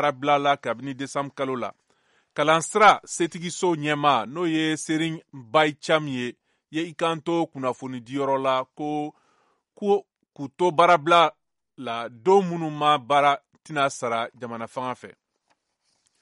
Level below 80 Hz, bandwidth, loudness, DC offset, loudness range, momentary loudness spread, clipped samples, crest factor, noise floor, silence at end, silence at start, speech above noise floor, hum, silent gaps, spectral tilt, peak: -70 dBFS; 11.5 kHz; -23 LUFS; under 0.1%; 6 LU; 14 LU; under 0.1%; 20 dB; -73 dBFS; 1.1 s; 0 s; 49 dB; none; none; -4.5 dB/octave; -4 dBFS